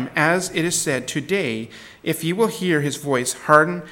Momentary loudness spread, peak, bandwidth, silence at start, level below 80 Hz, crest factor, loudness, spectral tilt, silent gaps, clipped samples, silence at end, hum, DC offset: 11 LU; 0 dBFS; 17.5 kHz; 0 s; -60 dBFS; 20 dB; -20 LUFS; -4 dB/octave; none; under 0.1%; 0 s; none; under 0.1%